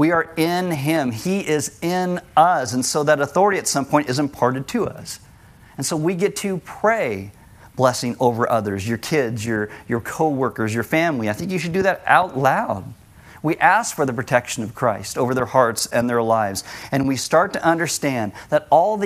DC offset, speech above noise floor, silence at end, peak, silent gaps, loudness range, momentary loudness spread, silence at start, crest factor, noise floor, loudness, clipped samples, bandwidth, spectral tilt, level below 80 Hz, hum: under 0.1%; 27 dB; 0 s; 0 dBFS; none; 3 LU; 9 LU; 0 s; 20 dB; -47 dBFS; -20 LUFS; under 0.1%; 16 kHz; -4.5 dB/octave; -54 dBFS; none